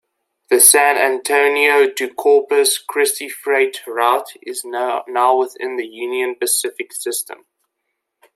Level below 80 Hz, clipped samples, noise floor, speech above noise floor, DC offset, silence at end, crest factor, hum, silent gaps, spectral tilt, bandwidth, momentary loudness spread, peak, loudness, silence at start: -74 dBFS; under 0.1%; -75 dBFS; 59 dB; under 0.1%; 1 s; 18 dB; none; none; 1 dB/octave; 16 kHz; 14 LU; 0 dBFS; -16 LUFS; 0.5 s